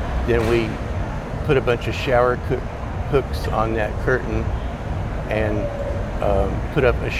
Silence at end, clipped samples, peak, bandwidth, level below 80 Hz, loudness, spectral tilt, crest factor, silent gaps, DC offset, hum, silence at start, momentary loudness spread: 0 s; under 0.1%; -4 dBFS; 14 kHz; -28 dBFS; -22 LUFS; -7 dB/octave; 18 dB; none; under 0.1%; none; 0 s; 8 LU